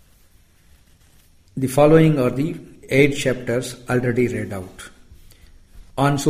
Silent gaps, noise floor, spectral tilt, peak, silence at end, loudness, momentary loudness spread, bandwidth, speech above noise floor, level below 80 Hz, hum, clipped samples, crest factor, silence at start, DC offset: none; -53 dBFS; -6.5 dB/octave; -2 dBFS; 0 s; -19 LUFS; 22 LU; 15.5 kHz; 35 dB; -46 dBFS; none; under 0.1%; 20 dB; 1.55 s; under 0.1%